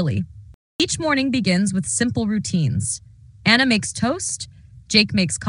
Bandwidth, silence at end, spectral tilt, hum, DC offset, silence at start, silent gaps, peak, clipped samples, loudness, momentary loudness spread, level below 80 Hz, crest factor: 11 kHz; 0 s; -4 dB/octave; none; under 0.1%; 0 s; 0.54-0.79 s; 0 dBFS; under 0.1%; -20 LUFS; 12 LU; -50 dBFS; 20 dB